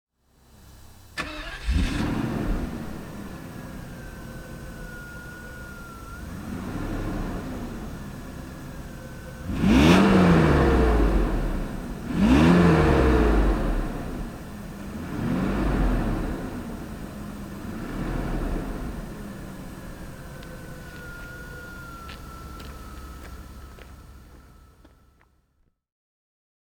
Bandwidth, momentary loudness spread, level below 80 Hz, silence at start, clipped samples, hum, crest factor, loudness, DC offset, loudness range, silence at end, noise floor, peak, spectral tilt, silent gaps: 19.5 kHz; 22 LU; -32 dBFS; 0.55 s; under 0.1%; none; 22 dB; -24 LUFS; under 0.1%; 19 LU; 1.95 s; -68 dBFS; -2 dBFS; -7 dB/octave; none